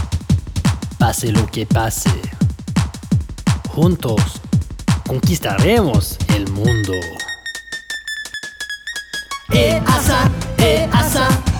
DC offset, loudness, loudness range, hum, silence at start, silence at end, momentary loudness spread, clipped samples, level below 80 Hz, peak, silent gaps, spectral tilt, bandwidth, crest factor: under 0.1%; -18 LUFS; 4 LU; none; 0 s; 0 s; 11 LU; under 0.1%; -28 dBFS; 0 dBFS; none; -5 dB/octave; over 20 kHz; 16 dB